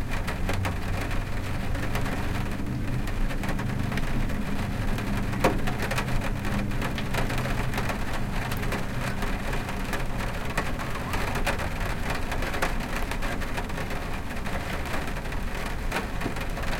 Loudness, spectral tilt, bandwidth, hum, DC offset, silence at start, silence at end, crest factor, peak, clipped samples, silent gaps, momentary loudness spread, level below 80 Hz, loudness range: -30 LUFS; -5.5 dB/octave; 17 kHz; none; under 0.1%; 0 s; 0 s; 20 dB; -6 dBFS; under 0.1%; none; 4 LU; -32 dBFS; 3 LU